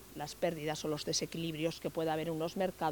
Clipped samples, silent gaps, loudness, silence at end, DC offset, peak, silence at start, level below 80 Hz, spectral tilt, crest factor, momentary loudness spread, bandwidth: under 0.1%; none; -37 LUFS; 0 s; under 0.1%; -20 dBFS; 0 s; -64 dBFS; -4 dB/octave; 16 dB; 3 LU; 19.5 kHz